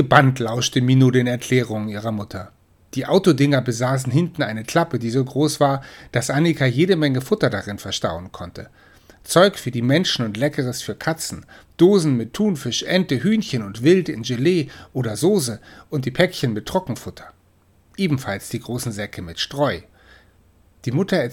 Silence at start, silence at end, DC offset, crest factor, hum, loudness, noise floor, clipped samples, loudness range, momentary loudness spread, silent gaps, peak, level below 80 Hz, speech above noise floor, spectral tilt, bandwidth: 0 s; 0 s; under 0.1%; 20 dB; none; -20 LUFS; -57 dBFS; under 0.1%; 6 LU; 13 LU; none; 0 dBFS; -52 dBFS; 37 dB; -5.5 dB/octave; 16.5 kHz